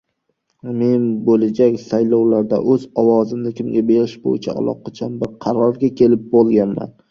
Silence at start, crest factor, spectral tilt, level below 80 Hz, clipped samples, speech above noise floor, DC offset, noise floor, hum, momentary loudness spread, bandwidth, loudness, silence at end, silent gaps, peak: 0.65 s; 14 dB; -9 dB/octave; -56 dBFS; under 0.1%; 53 dB; under 0.1%; -69 dBFS; none; 10 LU; 7 kHz; -17 LUFS; 0.2 s; none; -2 dBFS